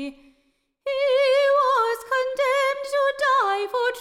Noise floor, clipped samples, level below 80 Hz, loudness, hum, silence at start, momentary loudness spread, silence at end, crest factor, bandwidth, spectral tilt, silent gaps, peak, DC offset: -68 dBFS; under 0.1%; -64 dBFS; -21 LUFS; none; 0 s; 6 LU; 0 s; 12 dB; 15.5 kHz; -0.5 dB/octave; none; -10 dBFS; under 0.1%